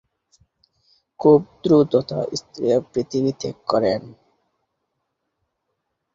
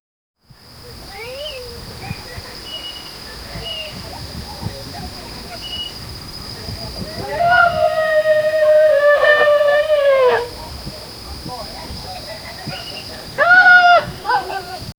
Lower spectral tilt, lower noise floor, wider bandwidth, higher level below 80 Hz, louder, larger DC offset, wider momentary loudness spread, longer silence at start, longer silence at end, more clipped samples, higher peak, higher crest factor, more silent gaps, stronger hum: first, -7 dB/octave vs -3.5 dB/octave; first, -76 dBFS vs -42 dBFS; second, 7.6 kHz vs over 20 kHz; second, -60 dBFS vs -42 dBFS; second, -20 LUFS vs -14 LUFS; neither; second, 10 LU vs 19 LU; first, 1.2 s vs 0.75 s; first, 2 s vs 0.05 s; neither; about the same, -2 dBFS vs 0 dBFS; about the same, 20 dB vs 18 dB; neither; neither